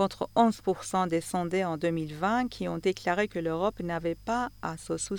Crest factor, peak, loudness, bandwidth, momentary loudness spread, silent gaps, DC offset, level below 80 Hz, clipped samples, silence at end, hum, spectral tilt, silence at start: 18 dB; -12 dBFS; -30 LUFS; 19.5 kHz; 7 LU; none; under 0.1%; -56 dBFS; under 0.1%; 0 s; none; -5 dB/octave; 0 s